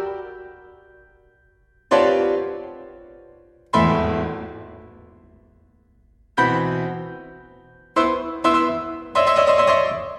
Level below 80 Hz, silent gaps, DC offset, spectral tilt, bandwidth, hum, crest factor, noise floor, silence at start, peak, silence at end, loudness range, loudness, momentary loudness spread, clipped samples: -48 dBFS; none; under 0.1%; -6 dB/octave; 12 kHz; none; 20 dB; -59 dBFS; 0 s; -4 dBFS; 0 s; 6 LU; -20 LUFS; 23 LU; under 0.1%